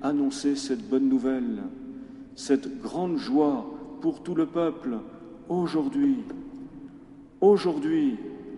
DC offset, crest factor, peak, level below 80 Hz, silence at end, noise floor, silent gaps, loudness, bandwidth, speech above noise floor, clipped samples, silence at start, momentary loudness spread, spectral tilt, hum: under 0.1%; 18 dB; -10 dBFS; -60 dBFS; 0 s; -48 dBFS; none; -26 LUFS; 11 kHz; 22 dB; under 0.1%; 0 s; 18 LU; -6.5 dB/octave; none